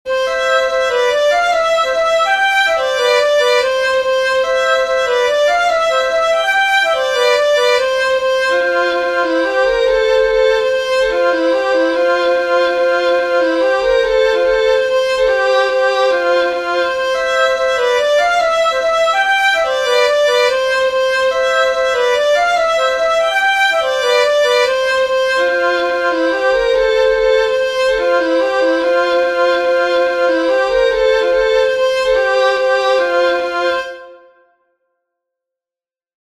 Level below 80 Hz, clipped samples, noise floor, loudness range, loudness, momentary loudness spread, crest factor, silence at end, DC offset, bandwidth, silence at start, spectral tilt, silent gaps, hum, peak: -44 dBFS; under 0.1%; under -90 dBFS; 1 LU; -13 LUFS; 3 LU; 12 dB; 2.1 s; 0.1%; 13 kHz; 0.05 s; -1.5 dB/octave; none; none; -2 dBFS